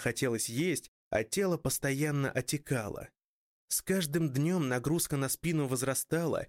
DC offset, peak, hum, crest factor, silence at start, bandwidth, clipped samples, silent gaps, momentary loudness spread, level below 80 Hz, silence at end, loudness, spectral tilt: under 0.1%; -18 dBFS; none; 14 dB; 0 s; 16.5 kHz; under 0.1%; 0.88-1.11 s, 3.24-3.68 s; 5 LU; -60 dBFS; 0 s; -32 LUFS; -4.5 dB/octave